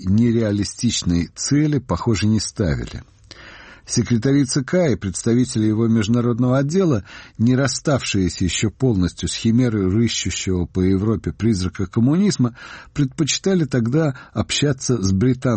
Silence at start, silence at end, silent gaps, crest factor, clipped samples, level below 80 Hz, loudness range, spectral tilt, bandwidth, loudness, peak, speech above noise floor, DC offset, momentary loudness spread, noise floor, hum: 0 s; 0 s; none; 12 dB; under 0.1%; -42 dBFS; 2 LU; -5.5 dB/octave; 8.8 kHz; -19 LUFS; -6 dBFS; 23 dB; under 0.1%; 5 LU; -42 dBFS; none